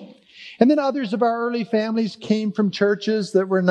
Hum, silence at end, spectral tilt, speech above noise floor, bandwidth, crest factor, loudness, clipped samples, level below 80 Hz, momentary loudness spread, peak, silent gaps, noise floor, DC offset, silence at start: none; 0 s; -6.5 dB/octave; 24 dB; 9.6 kHz; 20 dB; -21 LUFS; under 0.1%; -76 dBFS; 6 LU; 0 dBFS; none; -44 dBFS; under 0.1%; 0 s